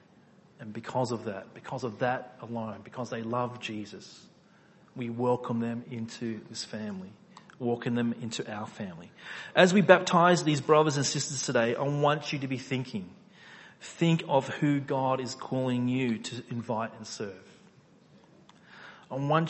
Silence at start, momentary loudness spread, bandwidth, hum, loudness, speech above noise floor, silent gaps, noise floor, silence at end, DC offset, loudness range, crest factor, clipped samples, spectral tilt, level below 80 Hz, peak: 0.6 s; 19 LU; 8.6 kHz; none; -29 LUFS; 30 dB; none; -59 dBFS; 0 s; under 0.1%; 11 LU; 28 dB; under 0.1%; -5 dB/octave; -72 dBFS; -2 dBFS